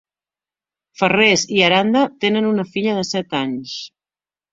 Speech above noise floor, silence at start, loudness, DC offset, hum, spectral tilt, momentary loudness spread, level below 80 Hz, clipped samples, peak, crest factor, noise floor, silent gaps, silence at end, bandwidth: over 73 dB; 1 s; -17 LUFS; under 0.1%; none; -4 dB/octave; 13 LU; -60 dBFS; under 0.1%; 0 dBFS; 18 dB; under -90 dBFS; none; 0.65 s; 7.8 kHz